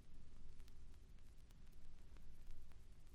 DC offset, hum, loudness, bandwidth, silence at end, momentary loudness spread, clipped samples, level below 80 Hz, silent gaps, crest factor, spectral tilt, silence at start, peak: under 0.1%; none; -66 LUFS; 7.2 kHz; 0 s; 3 LU; under 0.1%; -56 dBFS; none; 12 dB; -5.5 dB/octave; 0 s; -40 dBFS